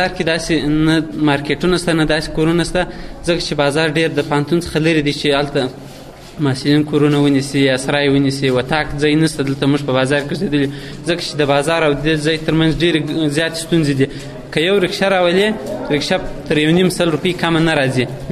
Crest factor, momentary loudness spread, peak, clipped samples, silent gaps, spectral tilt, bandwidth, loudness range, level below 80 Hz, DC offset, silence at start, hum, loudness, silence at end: 14 dB; 6 LU; -2 dBFS; under 0.1%; none; -5.5 dB/octave; 13.5 kHz; 2 LU; -36 dBFS; under 0.1%; 0 s; none; -16 LUFS; 0 s